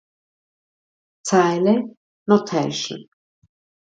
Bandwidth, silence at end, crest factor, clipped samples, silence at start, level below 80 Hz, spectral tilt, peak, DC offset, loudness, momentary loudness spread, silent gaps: 9.2 kHz; 0.95 s; 20 dB; under 0.1%; 1.25 s; -68 dBFS; -5 dB/octave; -2 dBFS; under 0.1%; -20 LUFS; 17 LU; 1.97-2.26 s